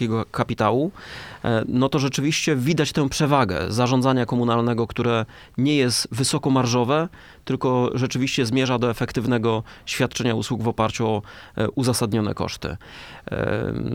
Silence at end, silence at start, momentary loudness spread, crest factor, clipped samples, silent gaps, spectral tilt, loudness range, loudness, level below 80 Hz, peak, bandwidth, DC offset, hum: 0 s; 0 s; 10 LU; 18 dB; under 0.1%; none; -5.5 dB/octave; 3 LU; -22 LUFS; -48 dBFS; -4 dBFS; 16.5 kHz; under 0.1%; none